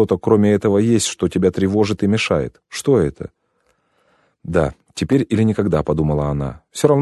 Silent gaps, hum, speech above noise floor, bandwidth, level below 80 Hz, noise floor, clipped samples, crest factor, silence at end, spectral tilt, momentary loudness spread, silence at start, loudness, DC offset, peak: none; none; 48 dB; 12.5 kHz; -38 dBFS; -64 dBFS; under 0.1%; 18 dB; 0 s; -6 dB/octave; 10 LU; 0 s; -18 LUFS; under 0.1%; 0 dBFS